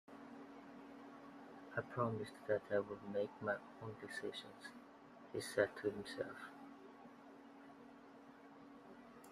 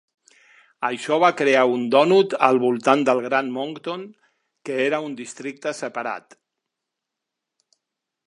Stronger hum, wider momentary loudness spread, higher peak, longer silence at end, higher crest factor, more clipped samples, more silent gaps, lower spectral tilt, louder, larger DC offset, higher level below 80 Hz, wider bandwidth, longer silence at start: neither; first, 20 LU vs 15 LU; second, -22 dBFS vs -2 dBFS; second, 0 s vs 2.1 s; about the same, 24 dB vs 22 dB; neither; neither; about the same, -5.5 dB/octave vs -5 dB/octave; second, -45 LUFS vs -21 LUFS; neither; about the same, -80 dBFS vs -78 dBFS; first, 15.5 kHz vs 11 kHz; second, 0.1 s vs 0.8 s